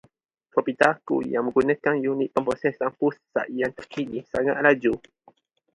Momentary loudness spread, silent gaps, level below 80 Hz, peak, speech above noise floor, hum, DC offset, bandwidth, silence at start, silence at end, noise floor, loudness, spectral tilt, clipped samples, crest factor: 9 LU; none; -60 dBFS; -2 dBFS; 36 dB; none; under 0.1%; 11 kHz; 0.55 s; 0.75 s; -59 dBFS; -24 LUFS; -6.5 dB/octave; under 0.1%; 22 dB